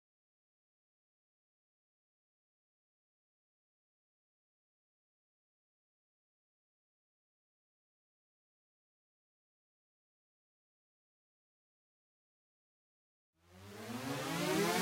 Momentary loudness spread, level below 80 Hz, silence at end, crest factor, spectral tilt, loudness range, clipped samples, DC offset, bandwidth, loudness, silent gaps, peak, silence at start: 20 LU; -84 dBFS; 0 s; 28 dB; -4 dB/octave; 18 LU; under 0.1%; under 0.1%; 16 kHz; -38 LUFS; none; -20 dBFS; 13.5 s